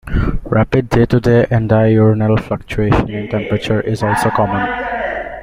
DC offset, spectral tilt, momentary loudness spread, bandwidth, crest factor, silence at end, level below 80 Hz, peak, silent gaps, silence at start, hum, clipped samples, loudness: under 0.1%; -7.5 dB/octave; 8 LU; 15 kHz; 14 dB; 0 s; -28 dBFS; 0 dBFS; none; 0.05 s; none; under 0.1%; -15 LUFS